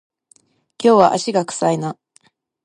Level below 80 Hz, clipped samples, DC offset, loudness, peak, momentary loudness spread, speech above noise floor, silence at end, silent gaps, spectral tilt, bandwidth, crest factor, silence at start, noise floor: -68 dBFS; under 0.1%; under 0.1%; -17 LUFS; 0 dBFS; 14 LU; 42 dB; 0.7 s; none; -5 dB/octave; 11.5 kHz; 18 dB; 0.8 s; -58 dBFS